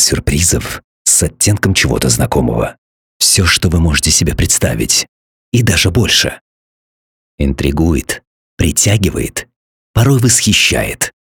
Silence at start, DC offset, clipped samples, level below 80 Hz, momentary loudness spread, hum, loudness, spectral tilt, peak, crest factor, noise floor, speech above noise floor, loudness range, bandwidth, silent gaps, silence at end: 0 s; under 0.1%; under 0.1%; -26 dBFS; 10 LU; none; -12 LUFS; -3.5 dB/octave; 0 dBFS; 14 dB; under -90 dBFS; over 78 dB; 4 LU; 19 kHz; 0.84-1.05 s, 2.78-3.20 s, 5.08-5.52 s, 6.41-7.38 s, 8.27-8.57 s, 9.56-9.94 s; 0.2 s